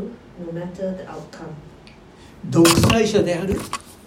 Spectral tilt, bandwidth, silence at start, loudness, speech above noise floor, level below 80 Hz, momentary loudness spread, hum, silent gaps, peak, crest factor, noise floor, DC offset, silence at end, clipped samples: -5 dB/octave; 16.5 kHz; 0 s; -19 LUFS; 25 dB; -42 dBFS; 23 LU; none; none; 0 dBFS; 20 dB; -45 dBFS; under 0.1%; 0.15 s; under 0.1%